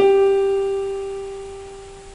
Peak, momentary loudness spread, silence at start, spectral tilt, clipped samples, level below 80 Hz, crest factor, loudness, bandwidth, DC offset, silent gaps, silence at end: -6 dBFS; 21 LU; 0 s; -5 dB/octave; under 0.1%; -46 dBFS; 14 dB; -20 LUFS; 10.5 kHz; under 0.1%; none; 0 s